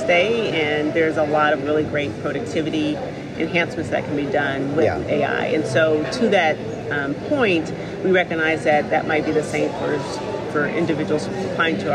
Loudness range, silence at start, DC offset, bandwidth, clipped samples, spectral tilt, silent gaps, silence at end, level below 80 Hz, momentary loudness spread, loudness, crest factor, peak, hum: 2 LU; 0 s; under 0.1%; 10.5 kHz; under 0.1%; -5.5 dB/octave; none; 0 s; -50 dBFS; 7 LU; -20 LUFS; 16 dB; -6 dBFS; none